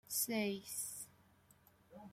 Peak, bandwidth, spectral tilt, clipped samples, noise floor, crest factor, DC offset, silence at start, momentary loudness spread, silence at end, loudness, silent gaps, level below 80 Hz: -26 dBFS; 16.5 kHz; -2.5 dB/octave; under 0.1%; -69 dBFS; 20 dB; under 0.1%; 0.1 s; 21 LU; 0 s; -40 LUFS; none; -80 dBFS